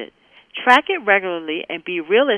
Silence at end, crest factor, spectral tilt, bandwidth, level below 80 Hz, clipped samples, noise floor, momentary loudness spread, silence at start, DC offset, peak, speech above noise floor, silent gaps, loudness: 0 s; 18 dB; -4 dB/octave; 11.5 kHz; -68 dBFS; under 0.1%; -47 dBFS; 13 LU; 0 s; under 0.1%; 0 dBFS; 29 dB; none; -18 LUFS